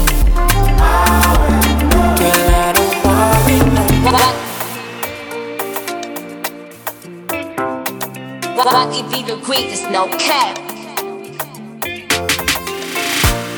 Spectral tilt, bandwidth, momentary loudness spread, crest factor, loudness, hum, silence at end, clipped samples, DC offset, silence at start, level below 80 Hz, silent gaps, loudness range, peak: -4 dB/octave; over 20 kHz; 14 LU; 14 dB; -15 LUFS; none; 0 s; under 0.1%; under 0.1%; 0 s; -20 dBFS; none; 11 LU; 0 dBFS